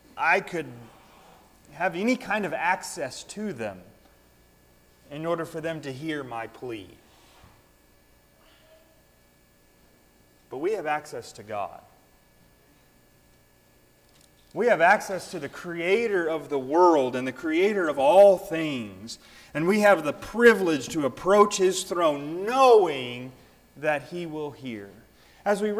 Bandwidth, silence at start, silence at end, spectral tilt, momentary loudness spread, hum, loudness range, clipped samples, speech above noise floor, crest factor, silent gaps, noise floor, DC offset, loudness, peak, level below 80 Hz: 16 kHz; 0.15 s; 0 s; -4.5 dB/octave; 19 LU; none; 16 LU; under 0.1%; 36 dB; 20 dB; none; -60 dBFS; under 0.1%; -24 LUFS; -6 dBFS; -62 dBFS